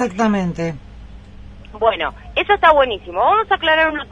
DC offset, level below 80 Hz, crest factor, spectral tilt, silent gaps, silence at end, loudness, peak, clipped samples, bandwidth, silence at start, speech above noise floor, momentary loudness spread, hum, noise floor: under 0.1%; -40 dBFS; 18 dB; -5.5 dB/octave; none; 0.05 s; -16 LUFS; 0 dBFS; under 0.1%; 10 kHz; 0 s; 20 dB; 11 LU; none; -37 dBFS